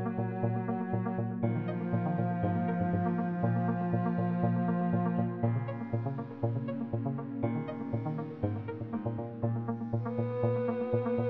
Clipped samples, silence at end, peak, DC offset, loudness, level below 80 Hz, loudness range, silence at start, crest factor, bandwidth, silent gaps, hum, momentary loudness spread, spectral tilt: under 0.1%; 0 s; -16 dBFS; under 0.1%; -33 LUFS; -64 dBFS; 5 LU; 0 s; 16 dB; 4.1 kHz; none; none; 5 LU; -9.5 dB/octave